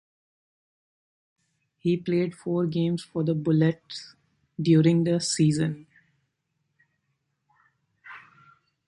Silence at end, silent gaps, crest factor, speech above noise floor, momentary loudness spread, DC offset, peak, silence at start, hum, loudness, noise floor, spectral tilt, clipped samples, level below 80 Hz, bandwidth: 0.7 s; none; 18 dB; 53 dB; 22 LU; under 0.1%; -8 dBFS; 1.85 s; none; -25 LUFS; -77 dBFS; -6.5 dB/octave; under 0.1%; -66 dBFS; 11.5 kHz